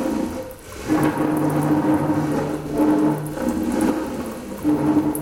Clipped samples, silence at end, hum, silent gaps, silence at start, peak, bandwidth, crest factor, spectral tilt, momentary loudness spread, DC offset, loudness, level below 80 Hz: under 0.1%; 0 s; none; none; 0 s; -6 dBFS; 17 kHz; 16 dB; -7 dB/octave; 10 LU; under 0.1%; -21 LUFS; -44 dBFS